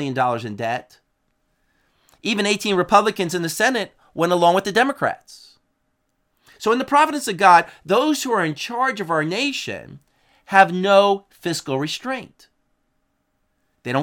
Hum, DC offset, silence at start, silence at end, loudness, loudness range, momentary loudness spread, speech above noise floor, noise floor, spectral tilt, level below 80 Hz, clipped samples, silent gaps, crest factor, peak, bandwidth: none; under 0.1%; 0 s; 0 s; -19 LUFS; 3 LU; 12 LU; 51 dB; -70 dBFS; -4 dB/octave; -64 dBFS; under 0.1%; none; 20 dB; 0 dBFS; 18 kHz